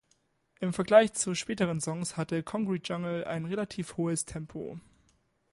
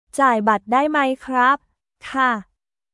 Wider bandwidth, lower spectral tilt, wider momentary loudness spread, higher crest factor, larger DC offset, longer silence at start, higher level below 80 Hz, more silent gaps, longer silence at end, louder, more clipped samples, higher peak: about the same, 11.5 kHz vs 12 kHz; about the same, -5 dB/octave vs -4.5 dB/octave; first, 16 LU vs 10 LU; first, 24 dB vs 16 dB; neither; first, 0.6 s vs 0.15 s; about the same, -62 dBFS vs -60 dBFS; neither; first, 0.7 s vs 0.5 s; second, -30 LUFS vs -19 LUFS; neither; second, -8 dBFS vs -4 dBFS